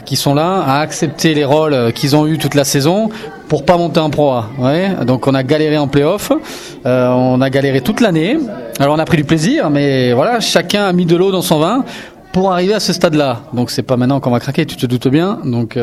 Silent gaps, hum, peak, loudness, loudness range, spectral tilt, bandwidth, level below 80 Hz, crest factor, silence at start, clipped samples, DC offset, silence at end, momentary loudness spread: none; none; 0 dBFS; -13 LUFS; 1 LU; -5.5 dB/octave; 16 kHz; -46 dBFS; 12 dB; 0 s; under 0.1%; under 0.1%; 0 s; 6 LU